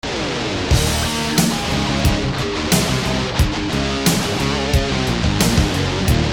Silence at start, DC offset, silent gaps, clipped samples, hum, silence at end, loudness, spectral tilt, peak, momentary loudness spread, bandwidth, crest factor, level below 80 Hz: 0.05 s; 0.2%; none; under 0.1%; none; 0 s; -18 LUFS; -4.5 dB/octave; -2 dBFS; 4 LU; 19.5 kHz; 16 dB; -26 dBFS